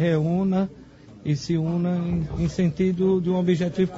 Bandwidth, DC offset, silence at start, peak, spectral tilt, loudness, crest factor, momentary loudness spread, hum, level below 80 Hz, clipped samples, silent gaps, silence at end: 7.8 kHz; under 0.1%; 0 s; -10 dBFS; -8 dB/octave; -24 LUFS; 14 dB; 6 LU; none; -44 dBFS; under 0.1%; none; 0 s